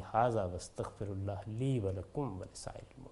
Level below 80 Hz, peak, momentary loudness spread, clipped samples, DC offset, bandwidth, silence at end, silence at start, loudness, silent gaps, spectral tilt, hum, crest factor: -58 dBFS; -16 dBFS; 14 LU; under 0.1%; under 0.1%; 11.5 kHz; 0 s; 0 s; -38 LUFS; none; -7 dB/octave; none; 20 dB